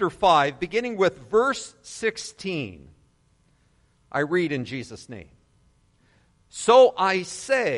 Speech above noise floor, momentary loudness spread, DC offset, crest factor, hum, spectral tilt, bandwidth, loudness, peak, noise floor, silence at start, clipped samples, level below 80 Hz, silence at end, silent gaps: 40 dB; 20 LU; under 0.1%; 20 dB; none; -4 dB/octave; 11.5 kHz; -23 LUFS; -4 dBFS; -63 dBFS; 0 s; under 0.1%; -58 dBFS; 0 s; none